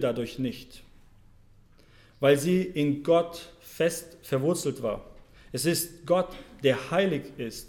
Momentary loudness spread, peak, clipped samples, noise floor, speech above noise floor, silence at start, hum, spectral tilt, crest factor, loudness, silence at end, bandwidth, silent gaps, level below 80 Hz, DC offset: 13 LU; -10 dBFS; under 0.1%; -56 dBFS; 29 dB; 0 s; none; -5 dB/octave; 18 dB; -28 LUFS; 0 s; 18 kHz; none; -56 dBFS; under 0.1%